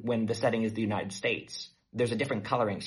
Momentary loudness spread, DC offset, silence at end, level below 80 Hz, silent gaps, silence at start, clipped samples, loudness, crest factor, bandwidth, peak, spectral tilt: 10 LU; under 0.1%; 0 s; -66 dBFS; none; 0 s; under 0.1%; -31 LUFS; 18 dB; 11.5 kHz; -12 dBFS; -5.5 dB/octave